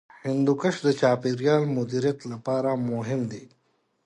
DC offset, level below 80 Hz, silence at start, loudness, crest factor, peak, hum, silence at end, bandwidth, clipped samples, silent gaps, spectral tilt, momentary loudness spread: under 0.1%; -68 dBFS; 0.25 s; -25 LUFS; 18 dB; -8 dBFS; none; 0.6 s; 11 kHz; under 0.1%; none; -7 dB/octave; 7 LU